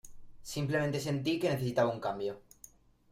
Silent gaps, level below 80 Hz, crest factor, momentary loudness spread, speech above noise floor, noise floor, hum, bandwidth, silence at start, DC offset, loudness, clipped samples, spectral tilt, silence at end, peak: none; -62 dBFS; 18 dB; 10 LU; 27 dB; -59 dBFS; none; 16 kHz; 0.05 s; under 0.1%; -33 LUFS; under 0.1%; -6 dB/octave; 0.7 s; -16 dBFS